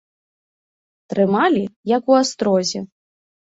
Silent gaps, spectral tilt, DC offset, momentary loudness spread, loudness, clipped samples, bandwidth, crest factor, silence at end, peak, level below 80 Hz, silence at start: 1.76-1.83 s; -5 dB/octave; under 0.1%; 11 LU; -18 LUFS; under 0.1%; 8 kHz; 18 dB; 0.65 s; -2 dBFS; -64 dBFS; 1.1 s